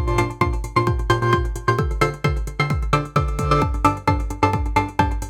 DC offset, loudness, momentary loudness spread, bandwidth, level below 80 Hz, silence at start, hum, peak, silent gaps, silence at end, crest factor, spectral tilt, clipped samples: under 0.1%; -21 LUFS; 4 LU; 16 kHz; -26 dBFS; 0 s; none; -4 dBFS; none; 0 s; 16 dB; -6.5 dB/octave; under 0.1%